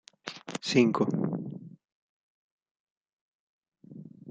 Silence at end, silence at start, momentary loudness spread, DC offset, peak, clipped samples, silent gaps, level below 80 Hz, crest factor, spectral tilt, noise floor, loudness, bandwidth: 0 s; 0.25 s; 23 LU; under 0.1%; -10 dBFS; under 0.1%; 1.92-2.58 s, 2.71-3.01 s, 3.13-3.62 s; -74 dBFS; 22 dB; -5.5 dB/octave; -48 dBFS; -28 LUFS; 9.2 kHz